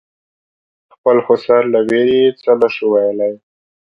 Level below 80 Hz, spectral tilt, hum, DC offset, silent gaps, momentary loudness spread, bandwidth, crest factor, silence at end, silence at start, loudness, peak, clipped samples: -58 dBFS; -7 dB/octave; none; under 0.1%; none; 7 LU; 5.8 kHz; 14 dB; 0.6 s; 1.05 s; -14 LUFS; 0 dBFS; under 0.1%